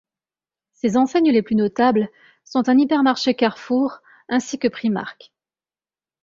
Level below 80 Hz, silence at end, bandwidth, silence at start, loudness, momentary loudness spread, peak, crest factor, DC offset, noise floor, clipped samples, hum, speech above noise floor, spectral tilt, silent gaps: -62 dBFS; 1.1 s; 7.6 kHz; 0.85 s; -20 LUFS; 9 LU; -2 dBFS; 18 dB; under 0.1%; under -90 dBFS; under 0.1%; none; over 71 dB; -5.5 dB/octave; none